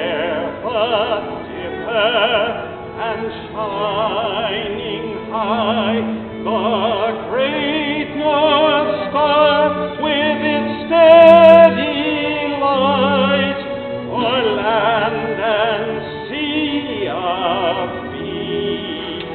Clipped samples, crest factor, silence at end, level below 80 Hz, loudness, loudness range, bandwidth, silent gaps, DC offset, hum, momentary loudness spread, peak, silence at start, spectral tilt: under 0.1%; 16 dB; 0 s; -48 dBFS; -16 LUFS; 9 LU; 4.4 kHz; none; under 0.1%; none; 12 LU; 0 dBFS; 0 s; -2.5 dB/octave